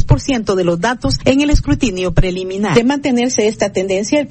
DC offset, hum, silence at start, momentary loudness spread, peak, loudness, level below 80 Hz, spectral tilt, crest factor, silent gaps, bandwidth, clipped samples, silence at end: under 0.1%; none; 0 s; 4 LU; 0 dBFS; -15 LUFS; -24 dBFS; -5.5 dB/octave; 14 dB; none; 8.8 kHz; 0.3%; 0 s